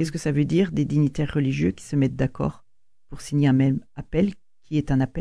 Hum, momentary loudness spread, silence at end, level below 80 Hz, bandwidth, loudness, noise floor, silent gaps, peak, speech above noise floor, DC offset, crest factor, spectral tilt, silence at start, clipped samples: none; 8 LU; 0 s; -44 dBFS; 11 kHz; -24 LUFS; -53 dBFS; none; -8 dBFS; 31 dB; 0.4%; 14 dB; -7.5 dB/octave; 0 s; under 0.1%